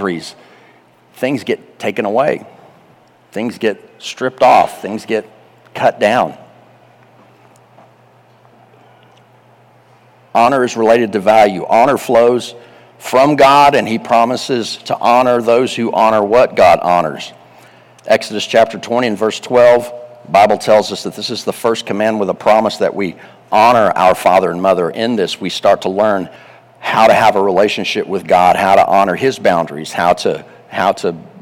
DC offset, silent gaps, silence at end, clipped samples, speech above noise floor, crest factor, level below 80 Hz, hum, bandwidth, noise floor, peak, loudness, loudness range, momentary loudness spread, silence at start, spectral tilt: under 0.1%; none; 0 s; under 0.1%; 35 dB; 12 dB; -52 dBFS; none; 17 kHz; -48 dBFS; -2 dBFS; -13 LUFS; 8 LU; 12 LU; 0 s; -4.5 dB/octave